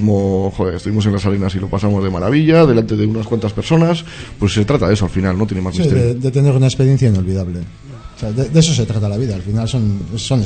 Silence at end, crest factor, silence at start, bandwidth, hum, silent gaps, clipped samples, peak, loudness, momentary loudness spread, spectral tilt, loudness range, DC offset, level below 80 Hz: 0 s; 14 dB; 0 s; 9.2 kHz; none; none; under 0.1%; 0 dBFS; -15 LUFS; 9 LU; -6.5 dB/octave; 2 LU; under 0.1%; -36 dBFS